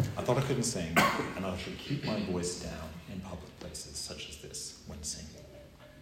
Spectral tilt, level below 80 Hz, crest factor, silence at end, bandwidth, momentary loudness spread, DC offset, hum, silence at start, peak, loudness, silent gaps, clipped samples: -4 dB/octave; -56 dBFS; 24 dB; 0 s; 16 kHz; 17 LU; under 0.1%; none; 0 s; -12 dBFS; -34 LUFS; none; under 0.1%